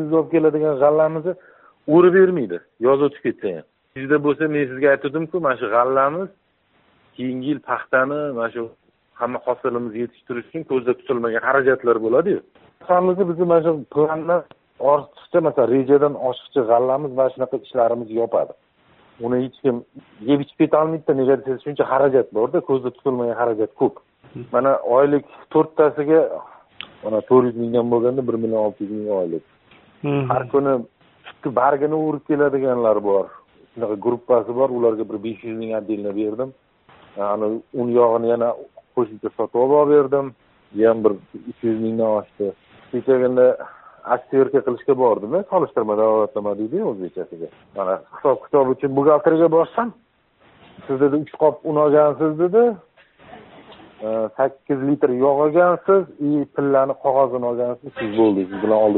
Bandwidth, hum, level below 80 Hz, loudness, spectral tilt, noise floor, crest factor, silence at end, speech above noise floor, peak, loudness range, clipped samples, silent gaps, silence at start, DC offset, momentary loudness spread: 4.1 kHz; none; -64 dBFS; -19 LUFS; -6.5 dB/octave; -61 dBFS; 18 dB; 0 s; 43 dB; -2 dBFS; 4 LU; under 0.1%; none; 0 s; under 0.1%; 12 LU